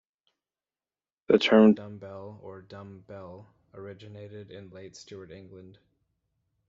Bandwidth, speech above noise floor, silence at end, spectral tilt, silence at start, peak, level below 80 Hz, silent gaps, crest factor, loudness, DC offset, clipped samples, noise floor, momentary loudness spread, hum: 7.4 kHz; over 62 dB; 1.5 s; -4.5 dB/octave; 1.3 s; -6 dBFS; -72 dBFS; none; 24 dB; -21 LUFS; under 0.1%; under 0.1%; under -90 dBFS; 26 LU; none